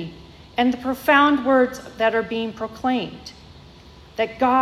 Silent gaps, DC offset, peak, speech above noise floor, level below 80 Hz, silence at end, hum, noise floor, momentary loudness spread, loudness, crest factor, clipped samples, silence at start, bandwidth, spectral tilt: none; under 0.1%; -4 dBFS; 25 dB; -52 dBFS; 0 s; none; -45 dBFS; 19 LU; -21 LUFS; 16 dB; under 0.1%; 0 s; 15.5 kHz; -5 dB/octave